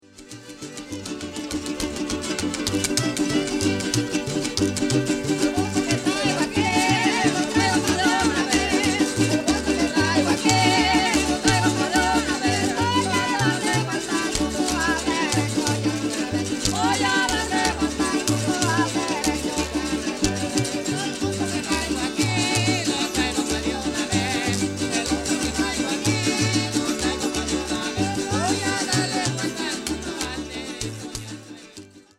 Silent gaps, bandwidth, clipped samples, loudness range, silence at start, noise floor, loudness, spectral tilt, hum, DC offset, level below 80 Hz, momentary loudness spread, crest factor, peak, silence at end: none; 16 kHz; under 0.1%; 5 LU; 0.15 s; -45 dBFS; -22 LUFS; -3.5 dB/octave; none; under 0.1%; -42 dBFS; 9 LU; 20 dB; -4 dBFS; 0.2 s